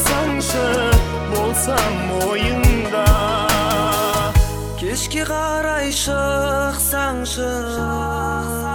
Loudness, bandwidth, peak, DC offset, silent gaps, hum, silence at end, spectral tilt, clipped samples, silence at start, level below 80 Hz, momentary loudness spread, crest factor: -19 LUFS; 19 kHz; 0 dBFS; under 0.1%; none; none; 0 s; -4 dB/octave; under 0.1%; 0 s; -24 dBFS; 6 LU; 18 dB